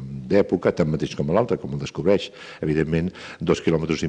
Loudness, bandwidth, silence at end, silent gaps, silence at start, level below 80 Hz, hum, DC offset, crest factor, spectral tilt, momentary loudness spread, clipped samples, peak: -23 LUFS; 9 kHz; 0 s; none; 0 s; -46 dBFS; none; under 0.1%; 16 dB; -7 dB/octave; 9 LU; under 0.1%; -6 dBFS